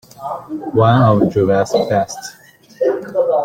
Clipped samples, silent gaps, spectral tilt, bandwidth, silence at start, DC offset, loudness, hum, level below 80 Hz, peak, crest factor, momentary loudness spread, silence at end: under 0.1%; none; -7 dB/octave; 15.5 kHz; 0.2 s; under 0.1%; -15 LUFS; none; -50 dBFS; -2 dBFS; 14 dB; 16 LU; 0 s